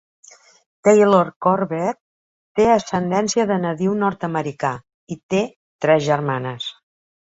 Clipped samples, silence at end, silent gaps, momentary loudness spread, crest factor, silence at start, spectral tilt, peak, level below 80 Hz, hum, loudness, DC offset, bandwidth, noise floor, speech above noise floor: under 0.1%; 0.6 s; 1.36-1.41 s, 2.00-2.55 s, 4.94-5.07 s, 5.23-5.29 s, 5.56-5.79 s; 14 LU; 18 dB; 0.85 s; -5.5 dB/octave; -2 dBFS; -58 dBFS; none; -19 LUFS; under 0.1%; 8 kHz; under -90 dBFS; over 72 dB